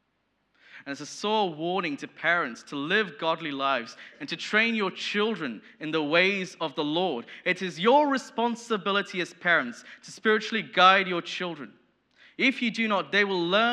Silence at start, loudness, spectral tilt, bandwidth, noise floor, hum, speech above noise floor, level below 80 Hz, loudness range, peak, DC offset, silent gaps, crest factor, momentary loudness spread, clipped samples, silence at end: 0.75 s; -26 LUFS; -4 dB/octave; 11.5 kHz; -74 dBFS; none; 47 dB; -86 dBFS; 3 LU; -6 dBFS; under 0.1%; none; 22 dB; 14 LU; under 0.1%; 0 s